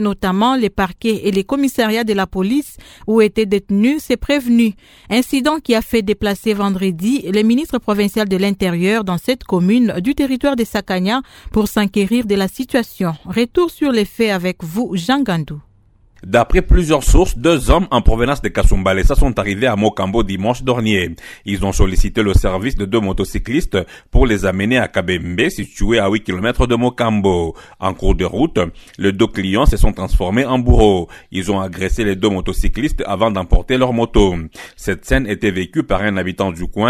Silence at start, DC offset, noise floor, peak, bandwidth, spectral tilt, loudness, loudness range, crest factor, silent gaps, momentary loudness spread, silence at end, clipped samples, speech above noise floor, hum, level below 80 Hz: 0 s; under 0.1%; -51 dBFS; 0 dBFS; 18 kHz; -6 dB/octave; -16 LUFS; 2 LU; 16 dB; none; 6 LU; 0 s; under 0.1%; 35 dB; none; -22 dBFS